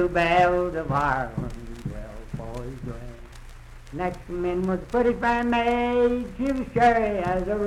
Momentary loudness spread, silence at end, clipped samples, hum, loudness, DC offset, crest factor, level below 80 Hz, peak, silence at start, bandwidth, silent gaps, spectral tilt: 17 LU; 0 s; under 0.1%; none; -24 LUFS; under 0.1%; 16 dB; -40 dBFS; -8 dBFS; 0 s; 13 kHz; none; -7 dB/octave